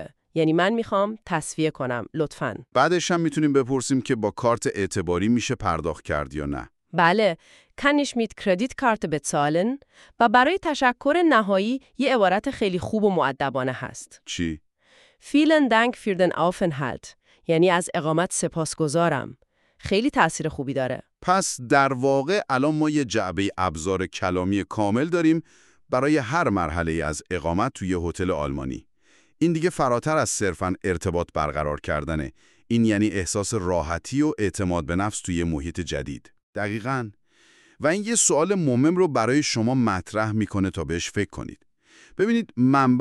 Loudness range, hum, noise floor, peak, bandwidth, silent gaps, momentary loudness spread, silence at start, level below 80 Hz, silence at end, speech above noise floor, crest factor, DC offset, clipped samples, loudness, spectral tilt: 4 LU; none; -61 dBFS; -4 dBFS; 12.5 kHz; 36.43-36.53 s; 10 LU; 0 s; -46 dBFS; 0 s; 39 dB; 20 dB; under 0.1%; under 0.1%; -23 LUFS; -5 dB/octave